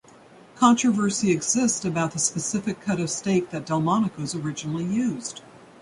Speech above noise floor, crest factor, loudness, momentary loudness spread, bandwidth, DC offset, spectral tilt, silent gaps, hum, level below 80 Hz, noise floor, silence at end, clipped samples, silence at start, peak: 26 dB; 20 dB; -24 LUFS; 9 LU; 11.5 kHz; under 0.1%; -4.5 dB/octave; none; none; -60 dBFS; -50 dBFS; 0.25 s; under 0.1%; 0.55 s; -4 dBFS